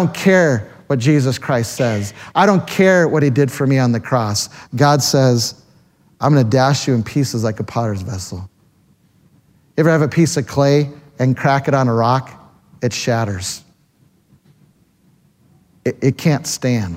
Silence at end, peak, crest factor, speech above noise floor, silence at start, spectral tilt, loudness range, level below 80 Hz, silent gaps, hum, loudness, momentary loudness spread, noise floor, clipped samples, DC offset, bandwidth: 0 s; 0 dBFS; 16 dB; 40 dB; 0 s; -5.5 dB/octave; 9 LU; -54 dBFS; none; none; -16 LUFS; 11 LU; -56 dBFS; under 0.1%; under 0.1%; 16 kHz